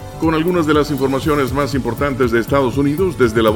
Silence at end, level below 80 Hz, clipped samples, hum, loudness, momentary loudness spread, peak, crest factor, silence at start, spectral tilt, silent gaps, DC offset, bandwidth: 0 s; -34 dBFS; under 0.1%; none; -16 LUFS; 4 LU; 0 dBFS; 16 dB; 0 s; -6.5 dB/octave; none; under 0.1%; 17 kHz